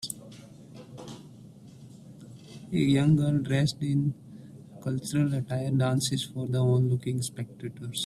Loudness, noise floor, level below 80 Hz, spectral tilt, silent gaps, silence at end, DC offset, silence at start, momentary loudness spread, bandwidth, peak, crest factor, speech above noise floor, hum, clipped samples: -28 LUFS; -49 dBFS; -60 dBFS; -6 dB/octave; none; 0 s; under 0.1%; 0 s; 24 LU; 14 kHz; -12 dBFS; 18 dB; 22 dB; none; under 0.1%